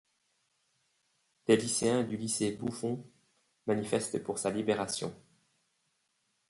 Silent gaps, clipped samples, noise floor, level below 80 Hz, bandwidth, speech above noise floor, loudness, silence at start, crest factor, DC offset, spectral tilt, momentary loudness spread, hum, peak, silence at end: none; under 0.1%; -78 dBFS; -70 dBFS; 11.5 kHz; 46 dB; -32 LUFS; 1.5 s; 24 dB; under 0.1%; -4 dB/octave; 10 LU; none; -12 dBFS; 1.35 s